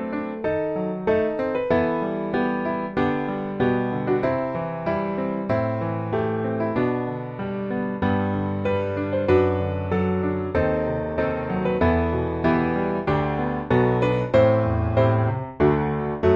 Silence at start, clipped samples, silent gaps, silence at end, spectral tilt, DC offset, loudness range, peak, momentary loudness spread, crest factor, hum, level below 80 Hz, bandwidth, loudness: 0 s; under 0.1%; none; 0 s; -9.5 dB/octave; under 0.1%; 4 LU; -6 dBFS; 6 LU; 16 dB; none; -42 dBFS; 7 kHz; -23 LUFS